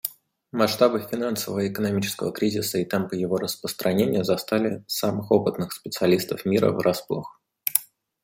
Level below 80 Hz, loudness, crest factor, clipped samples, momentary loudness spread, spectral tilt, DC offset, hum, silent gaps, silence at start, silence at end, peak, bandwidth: -64 dBFS; -24 LUFS; 24 dB; under 0.1%; 8 LU; -5 dB/octave; under 0.1%; none; none; 0.05 s; 0.4 s; 0 dBFS; 16.5 kHz